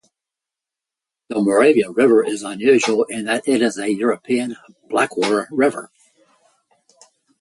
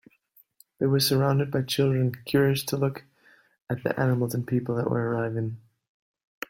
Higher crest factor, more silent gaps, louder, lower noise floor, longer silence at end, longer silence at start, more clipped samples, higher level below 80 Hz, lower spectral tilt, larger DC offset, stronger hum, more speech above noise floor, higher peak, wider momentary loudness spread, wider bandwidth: about the same, 18 dB vs 18 dB; second, none vs 3.62-3.67 s; first, -18 LUFS vs -26 LUFS; first, -87 dBFS vs -62 dBFS; first, 1.55 s vs 0.9 s; first, 1.3 s vs 0.8 s; neither; about the same, -66 dBFS vs -62 dBFS; second, -4.5 dB/octave vs -6 dB/octave; neither; neither; first, 69 dB vs 38 dB; first, -2 dBFS vs -10 dBFS; about the same, 9 LU vs 9 LU; second, 11.5 kHz vs 16.5 kHz